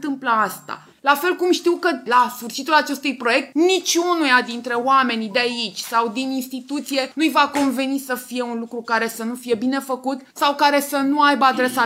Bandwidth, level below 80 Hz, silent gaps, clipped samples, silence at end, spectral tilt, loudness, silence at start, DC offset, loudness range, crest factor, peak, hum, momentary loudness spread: 16 kHz; -76 dBFS; none; under 0.1%; 0 s; -2.5 dB/octave; -19 LUFS; 0 s; under 0.1%; 4 LU; 18 dB; -2 dBFS; none; 9 LU